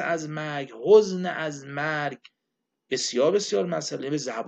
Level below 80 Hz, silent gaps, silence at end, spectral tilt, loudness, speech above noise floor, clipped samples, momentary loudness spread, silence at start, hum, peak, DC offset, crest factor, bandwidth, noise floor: -74 dBFS; none; 0 s; -4 dB/octave; -25 LUFS; 57 dB; under 0.1%; 13 LU; 0 s; none; -6 dBFS; under 0.1%; 20 dB; 8.6 kHz; -82 dBFS